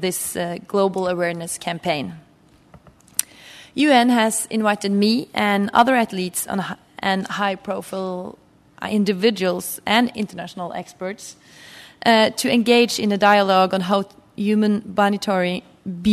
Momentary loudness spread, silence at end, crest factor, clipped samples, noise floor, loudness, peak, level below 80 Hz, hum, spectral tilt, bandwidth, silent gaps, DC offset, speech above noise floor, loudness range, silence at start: 15 LU; 0 s; 20 dB; under 0.1%; -53 dBFS; -20 LUFS; 0 dBFS; -62 dBFS; none; -4 dB/octave; 14 kHz; none; under 0.1%; 33 dB; 6 LU; 0 s